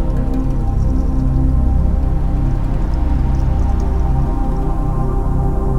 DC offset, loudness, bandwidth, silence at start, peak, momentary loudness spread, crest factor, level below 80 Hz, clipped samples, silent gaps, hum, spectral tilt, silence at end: under 0.1%; -18 LUFS; 6.2 kHz; 0 s; -4 dBFS; 4 LU; 10 dB; -16 dBFS; under 0.1%; none; none; -9.5 dB/octave; 0 s